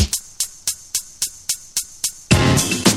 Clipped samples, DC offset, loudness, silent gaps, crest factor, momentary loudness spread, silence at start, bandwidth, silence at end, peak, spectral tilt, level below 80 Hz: under 0.1%; under 0.1%; -20 LUFS; none; 20 dB; 10 LU; 0 s; 19 kHz; 0 s; 0 dBFS; -3.5 dB/octave; -34 dBFS